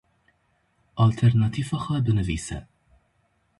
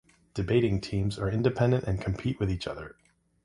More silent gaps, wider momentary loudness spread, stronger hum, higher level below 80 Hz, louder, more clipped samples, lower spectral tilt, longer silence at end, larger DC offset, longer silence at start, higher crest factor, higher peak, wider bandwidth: neither; first, 16 LU vs 12 LU; neither; about the same, -44 dBFS vs -46 dBFS; first, -24 LUFS vs -29 LUFS; neither; about the same, -7 dB/octave vs -7.5 dB/octave; first, 0.95 s vs 0.5 s; neither; first, 0.95 s vs 0.35 s; about the same, 16 dB vs 18 dB; about the same, -8 dBFS vs -10 dBFS; about the same, 11.5 kHz vs 11 kHz